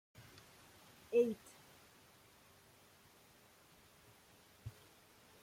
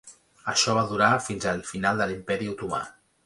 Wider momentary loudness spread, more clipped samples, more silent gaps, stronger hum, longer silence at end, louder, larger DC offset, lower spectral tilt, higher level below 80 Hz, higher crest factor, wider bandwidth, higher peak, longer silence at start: first, 28 LU vs 10 LU; neither; neither; neither; first, 0.7 s vs 0.35 s; second, -39 LUFS vs -25 LUFS; neither; first, -5.5 dB/octave vs -3.5 dB/octave; second, -78 dBFS vs -56 dBFS; about the same, 24 dB vs 22 dB; first, 16.5 kHz vs 11.5 kHz; second, -22 dBFS vs -6 dBFS; first, 0.2 s vs 0.05 s